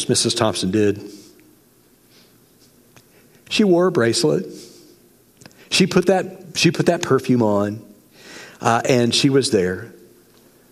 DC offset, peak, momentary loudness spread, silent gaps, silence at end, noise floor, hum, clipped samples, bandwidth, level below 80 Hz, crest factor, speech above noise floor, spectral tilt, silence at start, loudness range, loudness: under 0.1%; 0 dBFS; 19 LU; none; 0.8 s; -54 dBFS; none; under 0.1%; 15.5 kHz; -62 dBFS; 20 dB; 37 dB; -4.5 dB/octave; 0 s; 5 LU; -18 LUFS